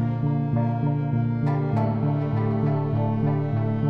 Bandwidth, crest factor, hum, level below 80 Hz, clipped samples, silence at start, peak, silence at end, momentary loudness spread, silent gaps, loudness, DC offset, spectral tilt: 4.7 kHz; 10 dB; none; -50 dBFS; under 0.1%; 0 s; -12 dBFS; 0 s; 1 LU; none; -24 LUFS; under 0.1%; -11.5 dB/octave